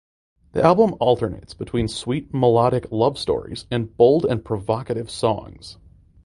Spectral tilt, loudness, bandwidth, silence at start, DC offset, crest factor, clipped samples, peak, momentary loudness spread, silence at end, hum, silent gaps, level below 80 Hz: -7 dB/octave; -21 LUFS; 11.5 kHz; 0.55 s; under 0.1%; 20 dB; under 0.1%; 0 dBFS; 13 LU; 0.55 s; none; none; -46 dBFS